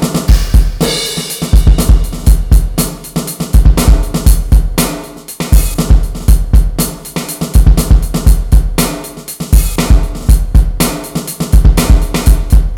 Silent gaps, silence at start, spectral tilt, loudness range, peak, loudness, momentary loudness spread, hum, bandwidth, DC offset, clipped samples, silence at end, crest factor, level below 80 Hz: none; 0 s; -5 dB/octave; 1 LU; 0 dBFS; -12 LUFS; 9 LU; none; 17.5 kHz; under 0.1%; 7%; 0 s; 8 dB; -10 dBFS